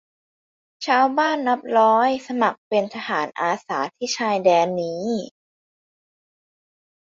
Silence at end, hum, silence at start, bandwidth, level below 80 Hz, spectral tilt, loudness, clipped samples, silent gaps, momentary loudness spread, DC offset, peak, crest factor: 1.9 s; none; 0.8 s; 7.6 kHz; -70 dBFS; -4 dB/octave; -21 LUFS; under 0.1%; 2.58-2.71 s; 9 LU; under 0.1%; -4 dBFS; 18 dB